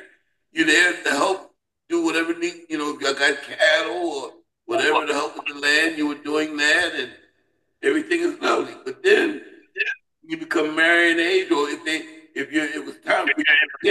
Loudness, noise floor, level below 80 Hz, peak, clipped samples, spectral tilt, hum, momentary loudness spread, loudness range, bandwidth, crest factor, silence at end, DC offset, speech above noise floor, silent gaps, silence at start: -20 LUFS; -69 dBFS; -74 dBFS; -4 dBFS; under 0.1%; -2 dB/octave; none; 14 LU; 2 LU; 12.5 kHz; 18 dB; 0 s; under 0.1%; 49 dB; none; 0 s